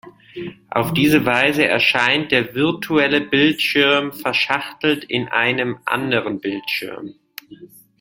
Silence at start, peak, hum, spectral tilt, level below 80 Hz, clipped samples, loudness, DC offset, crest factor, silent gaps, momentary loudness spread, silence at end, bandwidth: 0.05 s; 0 dBFS; none; -5 dB/octave; -56 dBFS; under 0.1%; -17 LUFS; under 0.1%; 18 dB; none; 18 LU; 0.35 s; 17 kHz